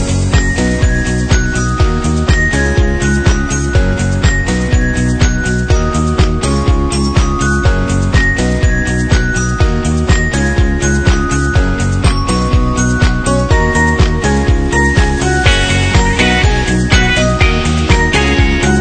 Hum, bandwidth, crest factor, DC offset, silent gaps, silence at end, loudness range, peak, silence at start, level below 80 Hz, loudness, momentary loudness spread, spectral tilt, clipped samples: none; 9.4 kHz; 10 dB; under 0.1%; none; 0 s; 2 LU; 0 dBFS; 0 s; -16 dBFS; -12 LUFS; 3 LU; -5 dB/octave; under 0.1%